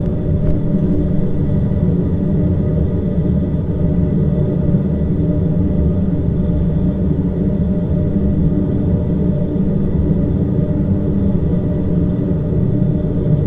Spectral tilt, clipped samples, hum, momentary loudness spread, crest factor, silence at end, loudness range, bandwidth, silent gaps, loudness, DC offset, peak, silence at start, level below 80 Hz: -12.5 dB/octave; under 0.1%; none; 2 LU; 14 dB; 0 s; 0 LU; 3.7 kHz; none; -17 LUFS; under 0.1%; -2 dBFS; 0 s; -24 dBFS